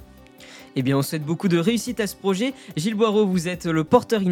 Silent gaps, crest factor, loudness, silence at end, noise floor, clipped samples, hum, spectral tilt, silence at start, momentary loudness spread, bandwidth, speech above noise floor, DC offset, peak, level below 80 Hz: none; 20 dB; -22 LUFS; 0 s; -46 dBFS; under 0.1%; none; -6 dB/octave; 0 s; 8 LU; 17.5 kHz; 25 dB; under 0.1%; -2 dBFS; -56 dBFS